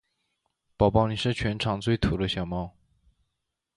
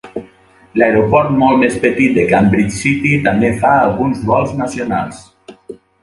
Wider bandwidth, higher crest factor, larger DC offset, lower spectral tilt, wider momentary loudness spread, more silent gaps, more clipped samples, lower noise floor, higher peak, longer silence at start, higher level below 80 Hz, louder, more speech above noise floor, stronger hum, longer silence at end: about the same, 11 kHz vs 11.5 kHz; first, 22 dB vs 14 dB; neither; about the same, -6.5 dB/octave vs -6.5 dB/octave; about the same, 10 LU vs 9 LU; neither; neither; first, -82 dBFS vs -45 dBFS; second, -6 dBFS vs 0 dBFS; first, 0.8 s vs 0.05 s; about the same, -42 dBFS vs -40 dBFS; second, -26 LUFS vs -13 LUFS; first, 56 dB vs 32 dB; neither; first, 1.05 s vs 0.3 s